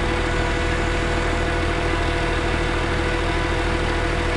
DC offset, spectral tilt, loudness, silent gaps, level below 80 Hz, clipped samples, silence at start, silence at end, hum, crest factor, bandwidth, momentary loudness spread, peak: 0.6%; -5.5 dB/octave; -22 LUFS; none; -26 dBFS; under 0.1%; 0 s; 0 s; none; 12 dB; 11.5 kHz; 0 LU; -8 dBFS